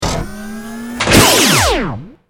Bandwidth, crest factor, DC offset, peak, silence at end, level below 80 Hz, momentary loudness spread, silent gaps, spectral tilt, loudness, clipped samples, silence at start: over 20 kHz; 14 dB; under 0.1%; 0 dBFS; 0.2 s; -28 dBFS; 19 LU; none; -3 dB/octave; -10 LUFS; 0.2%; 0 s